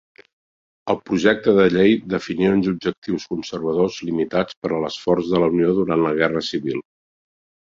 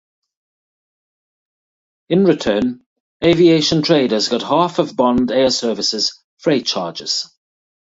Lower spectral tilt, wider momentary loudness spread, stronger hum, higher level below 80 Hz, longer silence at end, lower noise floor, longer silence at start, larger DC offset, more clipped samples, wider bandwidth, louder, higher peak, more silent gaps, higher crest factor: first, -6.5 dB/octave vs -4.5 dB/octave; about the same, 10 LU vs 9 LU; neither; about the same, -54 dBFS vs -50 dBFS; first, 0.95 s vs 0.7 s; about the same, under -90 dBFS vs under -90 dBFS; second, 0.85 s vs 2.1 s; neither; neither; about the same, 7.6 kHz vs 8 kHz; second, -20 LUFS vs -16 LUFS; about the same, -2 dBFS vs -2 dBFS; second, 2.98-3.02 s, 4.57-4.62 s vs 2.86-3.20 s, 6.24-6.37 s; about the same, 18 dB vs 16 dB